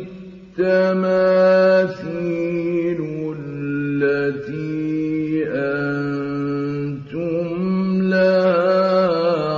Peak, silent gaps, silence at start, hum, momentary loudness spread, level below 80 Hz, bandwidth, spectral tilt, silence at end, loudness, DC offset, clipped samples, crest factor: -6 dBFS; none; 0 s; none; 11 LU; -56 dBFS; 7 kHz; -8.5 dB/octave; 0 s; -19 LUFS; under 0.1%; under 0.1%; 12 dB